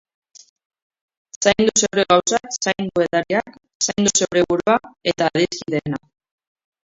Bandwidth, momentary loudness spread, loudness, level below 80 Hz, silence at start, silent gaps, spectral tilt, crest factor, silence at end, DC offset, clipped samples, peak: 7.8 kHz; 8 LU; -19 LUFS; -54 dBFS; 1.4 s; 3.75-3.80 s; -3 dB/octave; 20 dB; 0.9 s; under 0.1%; under 0.1%; 0 dBFS